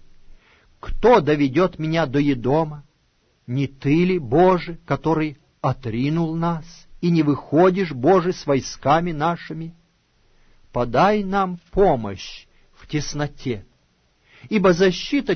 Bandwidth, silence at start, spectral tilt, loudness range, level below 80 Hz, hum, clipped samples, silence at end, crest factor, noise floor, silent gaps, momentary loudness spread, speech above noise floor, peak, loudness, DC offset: 6.6 kHz; 0.85 s; -7 dB/octave; 3 LU; -40 dBFS; none; under 0.1%; 0 s; 16 dB; -63 dBFS; none; 13 LU; 44 dB; -4 dBFS; -20 LUFS; under 0.1%